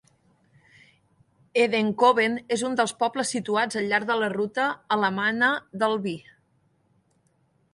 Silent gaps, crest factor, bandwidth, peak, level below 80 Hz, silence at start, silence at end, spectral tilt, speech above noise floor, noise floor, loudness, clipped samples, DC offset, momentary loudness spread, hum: none; 20 dB; 11.5 kHz; -6 dBFS; -72 dBFS; 1.55 s; 1.55 s; -4 dB/octave; 43 dB; -67 dBFS; -24 LUFS; under 0.1%; under 0.1%; 7 LU; none